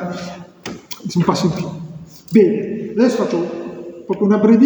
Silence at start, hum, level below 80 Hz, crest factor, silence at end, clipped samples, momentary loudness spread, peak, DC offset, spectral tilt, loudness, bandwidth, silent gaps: 0 s; none; -54 dBFS; 16 dB; 0 s; under 0.1%; 19 LU; 0 dBFS; under 0.1%; -7 dB/octave; -17 LUFS; over 20 kHz; none